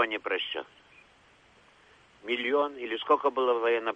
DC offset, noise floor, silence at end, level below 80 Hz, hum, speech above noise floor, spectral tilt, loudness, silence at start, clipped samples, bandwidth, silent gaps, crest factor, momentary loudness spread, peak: under 0.1%; -60 dBFS; 0 s; -74 dBFS; none; 32 dB; -4 dB/octave; -28 LUFS; 0 s; under 0.1%; 7.8 kHz; none; 18 dB; 11 LU; -12 dBFS